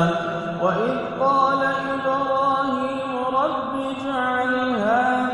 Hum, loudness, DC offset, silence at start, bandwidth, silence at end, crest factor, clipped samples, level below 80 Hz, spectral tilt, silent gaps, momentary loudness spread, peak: none; -22 LUFS; under 0.1%; 0 s; 11 kHz; 0 s; 14 dB; under 0.1%; -56 dBFS; -6.5 dB/octave; none; 6 LU; -6 dBFS